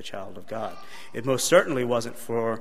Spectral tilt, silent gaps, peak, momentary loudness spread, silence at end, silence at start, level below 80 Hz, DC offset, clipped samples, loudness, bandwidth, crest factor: -4 dB/octave; none; -4 dBFS; 18 LU; 0 s; 0.05 s; -64 dBFS; 2%; under 0.1%; -25 LUFS; 15.5 kHz; 22 dB